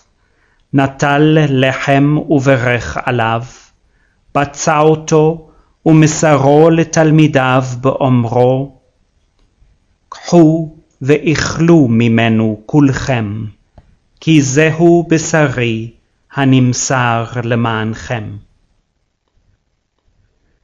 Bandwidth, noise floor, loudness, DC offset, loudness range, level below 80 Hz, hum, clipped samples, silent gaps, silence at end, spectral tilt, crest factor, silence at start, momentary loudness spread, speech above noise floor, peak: 7.8 kHz; -64 dBFS; -12 LUFS; under 0.1%; 5 LU; -42 dBFS; none; 0.3%; none; 2.25 s; -6 dB/octave; 12 dB; 0.75 s; 13 LU; 53 dB; 0 dBFS